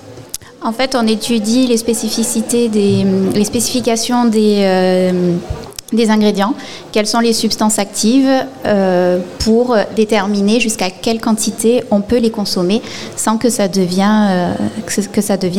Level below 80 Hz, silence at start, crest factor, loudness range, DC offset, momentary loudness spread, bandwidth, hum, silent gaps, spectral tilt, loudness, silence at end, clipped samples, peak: -42 dBFS; 0 s; 14 dB; 2 LU; 1%; 6 LU; 17 kHz; none; none; -4.5 dB/octave; -14 LUFS; 0 s; under 0.1%; 0 dBFS